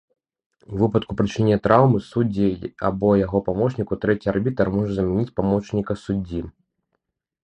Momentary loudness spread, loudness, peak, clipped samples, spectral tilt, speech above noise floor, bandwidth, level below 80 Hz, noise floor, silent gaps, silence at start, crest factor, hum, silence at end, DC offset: 9 LU; -21 LUFS; 0 dBFS; under 0.1%; -8.5 dB/octave; 56 dB; 8.6 kHz; -44 dBFS; -76 dBFS; none; 0.7 s; 22 dB; none; 0.95 s; under 0.1%